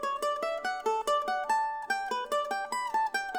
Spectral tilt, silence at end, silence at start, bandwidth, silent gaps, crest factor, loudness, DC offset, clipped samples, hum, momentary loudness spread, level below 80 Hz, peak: -0.5 dB/octave; 0 s; 0 s; over 20 kHz; none; 14 dB; -31 LUFS; under 0.1%; under 0.1%; none; 3 LU; -68 dBFS; -18 dBFS